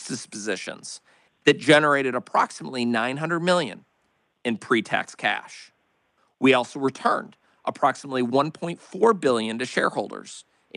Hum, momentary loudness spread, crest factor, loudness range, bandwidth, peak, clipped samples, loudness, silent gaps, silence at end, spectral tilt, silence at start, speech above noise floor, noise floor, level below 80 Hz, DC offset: none; 15 LU; 20 dB; 4 LU; 11.5 kHz; -4 dBFS; under 0.1%; -23 LUFS; none; 0.35 s; -4.5 dB/octave; 0 s; 46 dB; -70 dBFS; -72 dBFS; under 0.1%